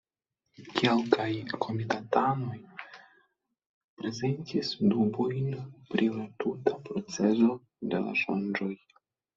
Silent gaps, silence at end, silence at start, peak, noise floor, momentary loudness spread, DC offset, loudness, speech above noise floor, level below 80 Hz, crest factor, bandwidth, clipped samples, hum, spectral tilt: 3.66-3.97 s; 0.6 s; 0.6 s; -6 dBFS; -85 dBFS; 12 LU; under 0.1%; -30 LUFS; 56 dB; -70 dBFS; 24 dB; 7.6 kHz; under 0.1%; none; -6 dB/octave